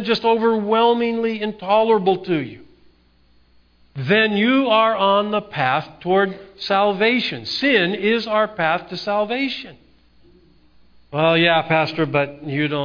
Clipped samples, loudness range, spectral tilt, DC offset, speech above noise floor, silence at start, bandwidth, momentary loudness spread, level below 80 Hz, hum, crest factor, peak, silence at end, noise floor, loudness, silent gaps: under 0.1%; 4 LU; -6.5 dB/octave; under 0.1%; 37 dB; 0 s; 5.2 kHz; 8 LU; -58 dBFS; 60 Hz at -55 dBFS; 16 dB; -2 dBFS; 0 s; -55 dBFS; -18 LUFS; none